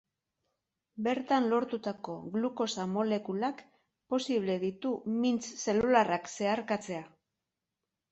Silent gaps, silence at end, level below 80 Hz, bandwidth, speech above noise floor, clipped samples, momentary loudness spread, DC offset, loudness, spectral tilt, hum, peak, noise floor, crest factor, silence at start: none; 1.05 s; -70 dBFS; 8.4 kHz; 57 dB; under 0.1%; 10 LU; under 0.1%; -32 LUFS; -5 dB/octave; none; -12 dBFS; -88 dBFS; 22 dB; 0.95 s